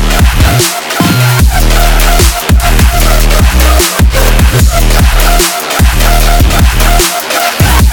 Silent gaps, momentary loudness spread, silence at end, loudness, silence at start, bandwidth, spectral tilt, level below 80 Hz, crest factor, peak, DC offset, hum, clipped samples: none; 2 LU; 0 s; -8 LUFS; 0 s; 19.5 kHz; -4 dB/octave; -8 dBFS; 6 dB; 0 dBFS; under 0.1%; none; 3%